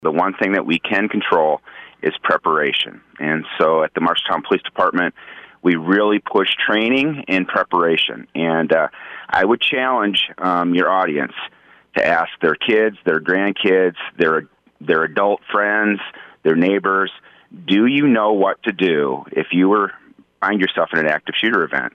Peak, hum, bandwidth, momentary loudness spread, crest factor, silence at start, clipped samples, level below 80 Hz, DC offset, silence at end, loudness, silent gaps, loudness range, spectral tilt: -4 dBFS; none; 9.8 kHz; 7 LU; 14 dB; 0 s; under 0.1%; -62 dBFS; under 0.1%; 0.05 s; -17 LUFS; none; 1 LU; -6.5 dB/octave